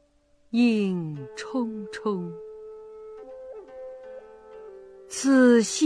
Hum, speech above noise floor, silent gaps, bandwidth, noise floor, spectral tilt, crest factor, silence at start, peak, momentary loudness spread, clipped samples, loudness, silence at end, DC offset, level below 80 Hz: none; 39 dB; none; 11 kHz; -62 dBFS; -5 dB/octave; 18 dB; 0.55 s; -8 dBFS; 26 LU; under 0.1%; -24 LUFS; 0 s; under 0.1%; -68 dBFS